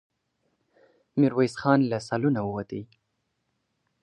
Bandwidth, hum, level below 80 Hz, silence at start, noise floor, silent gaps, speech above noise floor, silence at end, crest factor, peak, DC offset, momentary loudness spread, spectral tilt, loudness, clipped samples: 9.6 kHz; none; -64 dBFS; 1.15 s; -77 dBFS; none; 53 dB; 1.2 s; 22 dB; -6 dBFS; under 0.1%; 12 LU; -7.5 dB/octave; -25 LUFS; under 0.1%